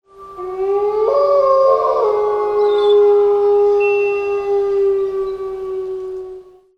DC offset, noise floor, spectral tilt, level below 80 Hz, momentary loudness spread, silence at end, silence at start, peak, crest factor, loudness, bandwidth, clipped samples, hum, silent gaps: under 0.1%; -36 dBFS; -5.5 dB/octave; -52 dBFS; 13 LU; 0.35 s; 0.2 s; -2 dBFS; 12 dB; -15 LUFS; 6.2 kHz; under 0.1%; none; none